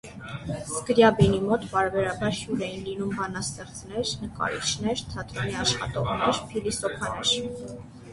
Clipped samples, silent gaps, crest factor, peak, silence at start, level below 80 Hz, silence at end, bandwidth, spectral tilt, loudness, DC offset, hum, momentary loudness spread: under 0.1%; none; 22 dB; -4 dBFS; 0.05 s; -46 dBFS; 0 s; 11.5 kHz; -4 dB/octave; -26 LUFS; under 0.1%; none; 14 LU